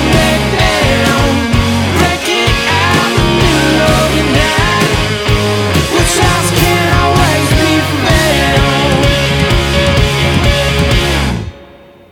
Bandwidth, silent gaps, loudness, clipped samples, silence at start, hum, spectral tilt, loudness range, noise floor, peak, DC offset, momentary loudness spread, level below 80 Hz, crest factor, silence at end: 19 kHz; none; -10 LUFS; under 0.1%; 0 s; none; -4.5 dB/octave; 1 LU; -37 dBFS; 0 dBFS; under 0.1%; 2 LU; -20 dBFS; 10 dB; 0.45 s